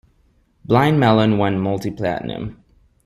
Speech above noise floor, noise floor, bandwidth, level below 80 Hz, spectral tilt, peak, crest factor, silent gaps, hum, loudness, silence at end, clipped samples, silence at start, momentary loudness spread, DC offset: 41 dB; -59 dBFS; 15.5 kHz; -48 dBFS; -7.5 dB/octave; -2 dBFS; 18 dB; none; none; -18 LUFS; 0.5 s; under 0.1%; 0.7 s; 14 LU; under 0.1%